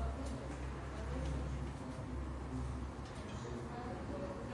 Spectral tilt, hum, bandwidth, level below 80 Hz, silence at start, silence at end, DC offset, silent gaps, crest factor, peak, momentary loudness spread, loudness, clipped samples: -6.5 dB/octave; none; 11.5 kHz; -46 dBFS; 0 s; 0 s; under 0.1%; none; 12 dB; -30 dBFS; 4 LU; -44 LUFS; under 0.1%